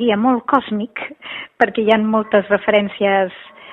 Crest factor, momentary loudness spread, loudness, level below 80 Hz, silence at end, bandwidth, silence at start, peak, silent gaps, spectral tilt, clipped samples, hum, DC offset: 18 dB; 13 LU; -17 LUFS; -58 dBFS; 0 s; 4.6 kHz; 0 s; 0 dBFS; none; -7.5 dB/octave; under 0.1%; none; under 0.1%